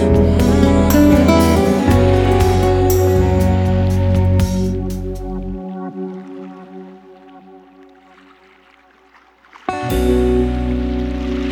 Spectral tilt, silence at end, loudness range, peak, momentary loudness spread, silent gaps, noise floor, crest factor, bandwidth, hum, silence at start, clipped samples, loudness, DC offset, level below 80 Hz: -7 dB/octave; 0 s; 19 LU; 0 dBFS; 17 LU; none; -50 dBFS; 16 dB; 19 kHz; none; 0 s; under 0.1%; -15 LUFS; under 0.1%; -24 dBFS